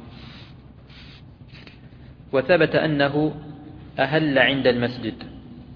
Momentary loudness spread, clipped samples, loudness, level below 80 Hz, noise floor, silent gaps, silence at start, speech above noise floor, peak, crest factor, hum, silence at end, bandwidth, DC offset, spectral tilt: 25 LU; under 0.1%; -21 LUFS; -50 dBFS; -45 dBFS; none; 0 s; 24 dB; -2 dBFS; 22 dB; none; 0 s; 5.4 kHz; under 0.1%; -8.5 dB/octave